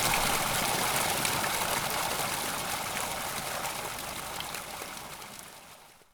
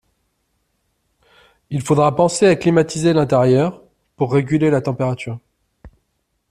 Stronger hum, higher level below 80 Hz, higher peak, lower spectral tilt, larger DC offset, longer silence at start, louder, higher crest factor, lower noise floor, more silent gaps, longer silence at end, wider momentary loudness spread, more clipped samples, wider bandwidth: neither; about the same, -52 dBFS vs -52 dBFS; second, -10 dBFS vs -2 dBFS; second, -1.5 dB/octave vs -6.5 dB/octave; neither; second, 0 s vs 1.7 s; second, -30 LUFS vs -17 LUFS; first, 22 dB vs 16 dB; second, -53 dBFS vs -70 dBFS; neither; second, 0.15 s vs 0.65 s; first, 15 LU vs 12 LU; neither; first, over 20 kHz vs 13.5 kHz